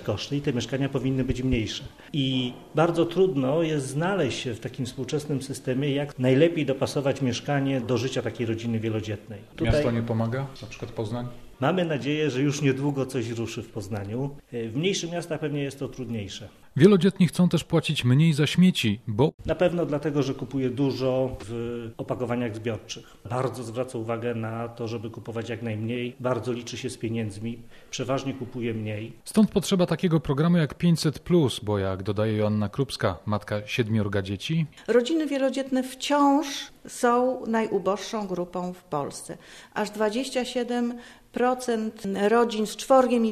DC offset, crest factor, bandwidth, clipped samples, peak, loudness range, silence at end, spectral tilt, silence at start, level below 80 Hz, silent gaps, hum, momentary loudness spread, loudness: under 0.1%; 22 dB; 14 kHz; under 0.1%; -4 dBFS; 8 LU; 0 s; -6 dB/octave; 0 s; -48 dBFS; 19.34-19.38 s; none; 12 LU; -26 LUFS